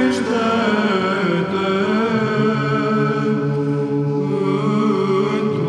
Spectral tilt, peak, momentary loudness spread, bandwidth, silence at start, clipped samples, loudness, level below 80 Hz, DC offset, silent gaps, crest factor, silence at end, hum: -7 dB/octave; -6 dBFS; 3 LU; 10.5 kHz; 0 s; under 0.1%; -18 LUFS; -62 dBFS; under 0.1%; none; 12 dB; 0 s; none